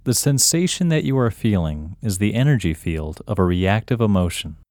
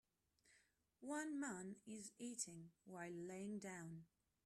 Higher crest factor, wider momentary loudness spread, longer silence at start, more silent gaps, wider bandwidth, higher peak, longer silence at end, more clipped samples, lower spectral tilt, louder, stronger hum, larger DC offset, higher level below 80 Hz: about the same, 18 dB vs 20 dB; about the same, 11 LU vs 12 LU; second, 0.05 s vs 0.45 s; neither; first, 19 kHz vs 14 kHz; first, -2 dBFS vs -34 dBFS; second, 0.15 s vs 0.4 s; neither; about the same, -5 dB/octave vs -4 dB/octave; first, -20 LUFS vs -52 LUFS; neither; neither; first, -38 dBFS vs -88 dBFS